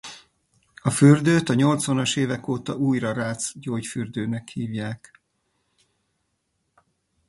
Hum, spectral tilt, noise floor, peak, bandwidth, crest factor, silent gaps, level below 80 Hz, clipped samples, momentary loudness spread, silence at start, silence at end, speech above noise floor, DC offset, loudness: none; -5.5 dB/octave; -74 dBFS; -2 dBFS; 11.5 kHz; 22 dB; none; -60 dBFS; under 0.1%; 14 LU; 0.05 s; 2.35 s; 52 dB; under 0.1%; -23 LUFS